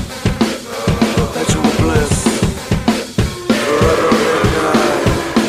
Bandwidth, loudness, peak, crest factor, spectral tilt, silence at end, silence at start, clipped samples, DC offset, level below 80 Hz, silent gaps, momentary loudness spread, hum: 16 kHz; -15 LUFS; -2 dBFS; 12 dB; -5 dB/octave; 0 s; 0 s; under 0.1%; under 0.1%; -28 dBFS; none; 5 LU; none